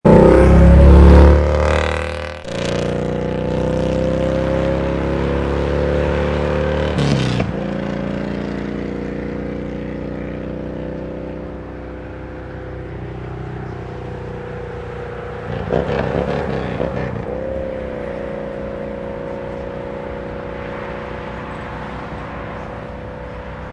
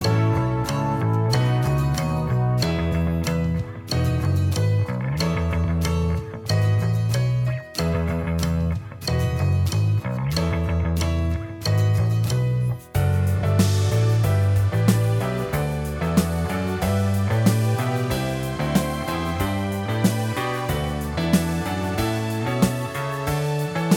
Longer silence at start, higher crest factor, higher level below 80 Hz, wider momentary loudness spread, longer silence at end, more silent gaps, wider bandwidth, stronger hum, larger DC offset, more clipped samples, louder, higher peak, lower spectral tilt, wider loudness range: about the same, 0.05 s vs 0 s; about the same, 16 dB vs 18 dB; first, -22 dBFS vs -36 dBFS; first, 18 LU vs 6 LU; about the same, 0 s vs 0 s; neither; second, 9.2 kHz vs 17.5 kHz; neither; neither; neither; first, -18 LUFS vs -23 LUFS; first, 0 dBFS vs -4 dBFS; first, -8 dB/octave vs -6.5 dB/octave; first, 13 LU vs 3 LU